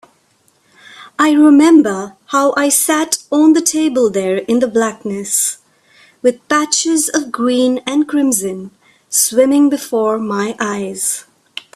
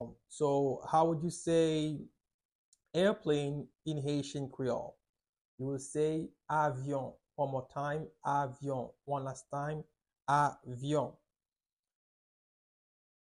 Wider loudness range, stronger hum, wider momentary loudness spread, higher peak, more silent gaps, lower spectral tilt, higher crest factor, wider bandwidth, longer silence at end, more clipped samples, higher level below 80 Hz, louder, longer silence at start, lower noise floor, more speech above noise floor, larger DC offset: about the same, 4 LU vs 5 LU; neither; about the same, 10 LU vs 11 LU; first, 0 dBFS vs -16 dBFS; second, none vs 2.34-2.39 s, 2.45-2.49 s, 2.55-2.72 s, 5.29-5.33 s, 5.41-5.58 s; second, -3 dB/octave vs -6 dB/octave; second, 14 dB vs 20 dB; first, 15.5 kHz vs 11.5 kHz; second, 0.55 s vs 2.25 s; neither; first, -60 dBFS vs -68 dBFS; first, -14 LUFS vs -35 LUFS; first, 1 s vs 0 s; second, -56 dBFS vs under -90 dBFS; second, 43 dB vs over 56 dB; neither